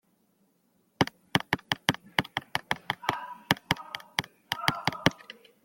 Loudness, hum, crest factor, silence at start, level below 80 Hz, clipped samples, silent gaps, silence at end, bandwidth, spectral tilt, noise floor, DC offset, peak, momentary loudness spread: -30 LUFS; none; 30 dB; 1 s; -60 dBFS; under 0.1%; none; 0.3 s; 17 kHz; -4 dB/octave; -70 dBFS; under 0.1%; -2 dBFS; 6 LU